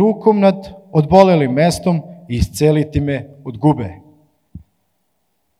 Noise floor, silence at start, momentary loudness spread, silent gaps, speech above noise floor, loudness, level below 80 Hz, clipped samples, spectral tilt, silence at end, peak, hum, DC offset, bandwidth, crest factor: -68 dBFS; 0 s; 14 LU; none; 54 dB; -15 LUFS; -38 dBFS; under 0.1%; -7 dB/octave; 1 s; 0 dBFS; none; under 0.1%; 13.5 kHz; 16 dB